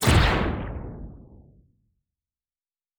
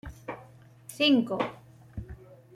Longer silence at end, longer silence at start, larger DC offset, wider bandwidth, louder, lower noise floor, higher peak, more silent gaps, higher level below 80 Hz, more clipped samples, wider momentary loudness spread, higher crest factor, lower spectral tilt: first, 1.75 s vs 0.2 s; about the same, 0 s vs 0.05 s; neither; first, over 20 kHz vs 15.5 kHz; about the same, -24 LUFS vs -26 LUFS; first, under -90 dBFS vs -53 dBFS; first, -6 dBFS vs -12 dBFS; neither; first, -32 dBFS vs -54 dBFS; neither; about the same, 22 LU vs 24 LU; about the same, 22 dB vs 20 dB; about the same, -5 dB/octave vs -5 dB/octave